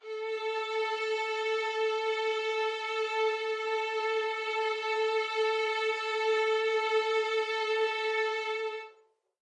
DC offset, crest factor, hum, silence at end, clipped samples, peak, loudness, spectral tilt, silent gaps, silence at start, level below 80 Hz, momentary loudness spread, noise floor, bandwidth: under 0.1%; 14 dB; none; 0.55 s; under 0.1%; -18 dBFS; -30 LUFS; 2 dB/octave; none; 0.05 s; under -90 dBFS; 5 LU; -64 dBFS; 9.8 kHz